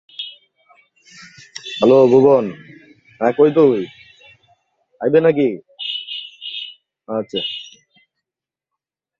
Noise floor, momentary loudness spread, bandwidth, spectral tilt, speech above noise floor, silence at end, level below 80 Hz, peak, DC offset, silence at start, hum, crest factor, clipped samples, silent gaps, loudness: -88 dBFS; 20 LU; 7.6 kHz; -6.5 dB/octave; 74 dB; 1.55 s; -62 dBFS; 0 dBFS; under 0.1%; 0.2 s; none; 18 dB; under 0.1%; none; -16 LUFS